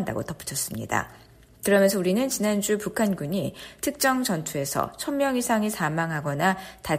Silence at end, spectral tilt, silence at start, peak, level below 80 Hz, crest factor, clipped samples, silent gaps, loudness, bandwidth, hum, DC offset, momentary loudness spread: 0 s; -4.5 dB/octave; 0 s; -8 dBFS; -56 dBFS; 18 dB; under 0.1%; none; -25 LUFS; 15.5 kHz; none; under 0.1%; 9 LU